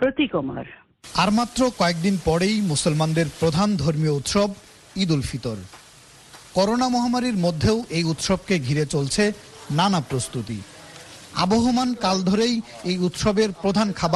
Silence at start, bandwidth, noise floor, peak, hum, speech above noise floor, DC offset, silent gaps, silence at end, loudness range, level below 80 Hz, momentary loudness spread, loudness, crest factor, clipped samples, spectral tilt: 0 s; 12.5 kHz; -48 dBFS; -4 dBFS; none; 27 dB; under 0.1%; none; 0 s; 3 LU; -46 dBFS; 11 LU; -22 LUFS; 18 dB; under 0.1%; -5 dB/octave